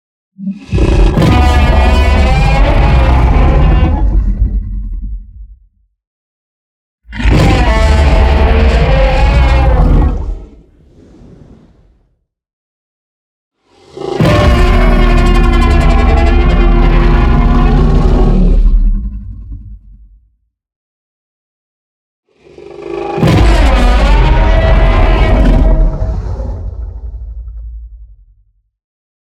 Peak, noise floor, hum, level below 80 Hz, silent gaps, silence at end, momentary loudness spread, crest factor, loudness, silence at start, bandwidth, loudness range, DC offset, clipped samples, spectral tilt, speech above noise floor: 0 dBFS; -60 dBFS; none; -12 dBFS; 6.07-6.98 s, 12.53-13.51 s, 20.76-22.23 s; 1.3 s; 17 LU; 10 dB; -11 LUFS; 0.4 s; 8.8 kHz; 11 LU; under 0.1%; under 0.1%; -7 dB/octave; 52 dB